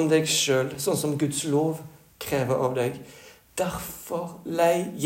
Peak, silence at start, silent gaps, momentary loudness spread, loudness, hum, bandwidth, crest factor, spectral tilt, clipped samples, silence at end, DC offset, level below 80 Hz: -8 dBFS; 0 s; none; 14 LU; -26 LUFS; none; 16.5 kHz; 18 dB; -4 dB/octave; under 0.1%; 0 s; under 0.1%; -58 dBFS